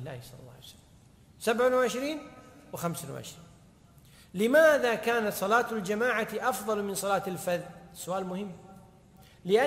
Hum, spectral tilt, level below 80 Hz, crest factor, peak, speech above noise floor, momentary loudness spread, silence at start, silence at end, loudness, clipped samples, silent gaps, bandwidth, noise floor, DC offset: none; -4 dB/octave; -64 dBFS; 20 dB; -10 dBFS; 28 dB; 21 LU; 0 s; 0 s; -28 LUFS; under 0.1%; none; 16 kHz; -57 dBFS; under 0.1%